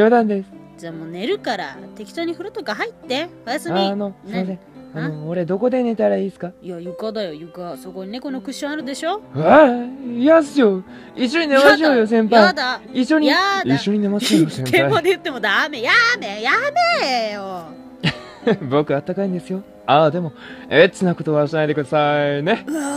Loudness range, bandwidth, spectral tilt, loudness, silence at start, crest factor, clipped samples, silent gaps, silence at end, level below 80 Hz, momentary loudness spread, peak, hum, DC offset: 9 LU; 15.5 kHz; -5.5 dB/octave; -18 LUFS; 0 s; 18 dB; under 0.1%; none; 0 s; -58 dBFS; 17 LU; 0 dBFS; none; under 0.1%